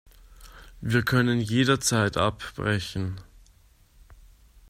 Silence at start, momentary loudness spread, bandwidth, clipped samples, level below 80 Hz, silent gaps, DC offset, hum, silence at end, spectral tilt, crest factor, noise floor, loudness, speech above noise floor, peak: 0.4 s; 12 LU; 15.5 kHz; under 0.1%; -50 dBFS; none; under 0.1%; none; 0.55 s; -4.5 dB/octave; 20 dB; -58 dBFS; -25 LUFS; 33 dB; -8 dBFS